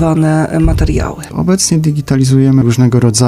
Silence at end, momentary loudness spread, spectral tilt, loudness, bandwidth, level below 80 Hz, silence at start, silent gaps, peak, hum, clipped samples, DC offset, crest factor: 0 s; 6 LU; -6 dB/octave; -11 LUFS; 14.5 kHz; -22 dBFS; 0 s; none; 0 dBFS; none; under 0.1%; under 0.1%; 10 dB